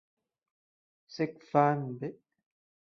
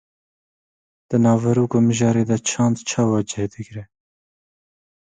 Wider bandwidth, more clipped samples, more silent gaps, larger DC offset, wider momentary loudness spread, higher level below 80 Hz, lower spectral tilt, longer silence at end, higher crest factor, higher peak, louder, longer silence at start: second, 6.8 kHz vs 9.4 kHz; neither; neither; neither; first, 15 LU vs 12 LU; second, -78 dBFS vs -54 dBFS; first, -8 dB/octave vs -6 dB/octave; second, 0.75 s vs 1.2 s; first, 24 dB vs 16 dB; second, -10 dBFS vs -4 dBFS; second, -31 LUFS vs -19 LUFS; about the same, 1.1 s vs 1.1 s